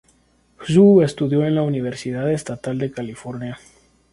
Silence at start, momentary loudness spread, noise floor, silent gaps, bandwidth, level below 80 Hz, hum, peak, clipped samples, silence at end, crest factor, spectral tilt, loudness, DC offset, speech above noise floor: 0.6 s; 18 LU; -59 dBFS; none; 11.5 kHz; -54 dBFS; none; -2 dBFS; under 0.1%; 0.55 s; 18 dB; -7.5 dB/octave; -18 LUFS; under 0.1%; 40 dB